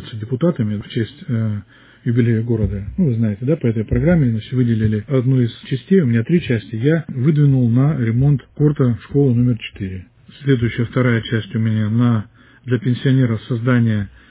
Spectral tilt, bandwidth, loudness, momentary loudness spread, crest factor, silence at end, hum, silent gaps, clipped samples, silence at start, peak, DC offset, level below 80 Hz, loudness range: -12.5 dB/octave; 4 kHz; -18 LUFS; 9 LU; 14 dB; 0.2 s; none; none; under 0.1%; 0 s; -2 dBFS; under 0.1%; -38 dBFS; 3 LU